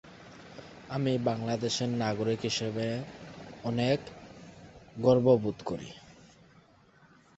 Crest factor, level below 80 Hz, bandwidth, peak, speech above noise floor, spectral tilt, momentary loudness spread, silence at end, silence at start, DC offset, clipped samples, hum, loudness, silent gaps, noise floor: 22 dB; -62 dBFS; 8.2 kHz; -10 dBFS; 32 dB; -6 dB/octave; 24 LU; 1.25 s; 0.05 s; under 0.1%; under 0.1%; none; -30 LUFS; none; -61 dBFS